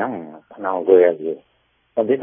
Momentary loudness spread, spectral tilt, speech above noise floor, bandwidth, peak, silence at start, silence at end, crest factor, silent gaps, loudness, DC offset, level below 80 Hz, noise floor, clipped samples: 19 LU; -11 dB/octave; 25 dB; 3.6 kHz; 0 dBFS; 0 s; 0 s; 18 dB; none; -19 LUFS; under 0.1%; -66 dBFS; -42 dBFS; under 0.1%